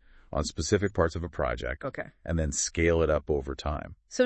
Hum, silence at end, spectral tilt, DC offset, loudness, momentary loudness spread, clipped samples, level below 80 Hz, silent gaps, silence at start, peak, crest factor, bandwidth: none; 0 s; -4.5 dB/octave; under 0.1%; -29 LUFS; 11 LU; under 0.1%; -42 dBFS; none; 0.3 s; -10 dBFS; 20 dB; 8.6 kHz